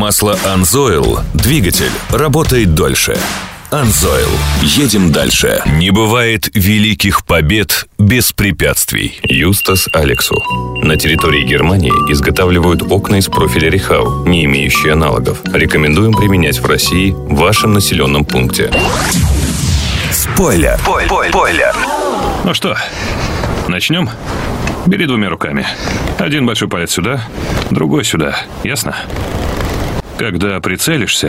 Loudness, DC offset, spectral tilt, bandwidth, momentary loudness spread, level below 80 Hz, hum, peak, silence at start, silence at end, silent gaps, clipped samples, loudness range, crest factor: -11 LUFS; under 0.1%; -4.5 dB/octave; 16.5 kHz; 7 LU; -24 dBFS; none; 0 dBFS; 0 s; 0 s; none; under 0.1%; 5 LU; 12 dB